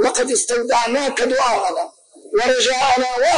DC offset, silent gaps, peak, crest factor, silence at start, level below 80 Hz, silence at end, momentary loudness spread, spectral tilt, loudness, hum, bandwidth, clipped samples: 0.5%; none; -6 dBFS; 10 dB; 0 s; -52 dBFS; 0 s; 7 LU; -0.5 dB/octave; -17 LUFS; none; 11 kHz; under 0.1%